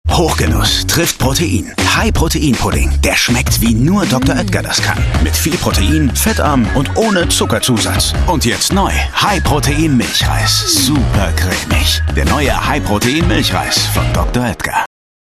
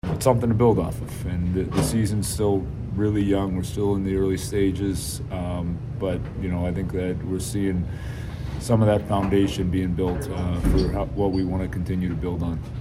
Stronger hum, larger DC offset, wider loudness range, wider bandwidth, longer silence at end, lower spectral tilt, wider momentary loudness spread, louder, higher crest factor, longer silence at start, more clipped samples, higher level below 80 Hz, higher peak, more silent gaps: neither; neither; second, 1 LU vs 4 LU; about the same, 15 kHz vs 16 kHz; first, 0.4 s vs 0 s; second, -4 dB/octave vs -7 dB/octave; second, 3 LU vs 9 LU; first, -13 LUFS vs -24 LUFS; second, 12 dB vs 20 dB; about the same, 0.05 s vs 0.05 s; neither; first, -20 dBFS vs -34 dBFS; first, 0 dBFS vs -4 dBFS; neither